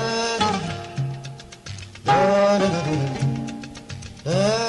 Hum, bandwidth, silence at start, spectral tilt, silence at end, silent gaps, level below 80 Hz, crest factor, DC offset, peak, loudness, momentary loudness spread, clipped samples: none; 11.5 kHz; 0 s; -5 dB/octave; 0 s; none; -50 dBFS; 16 dB; under 0.1%; -6 dBFS; -22 LUFS; 19 LU; under 0.1%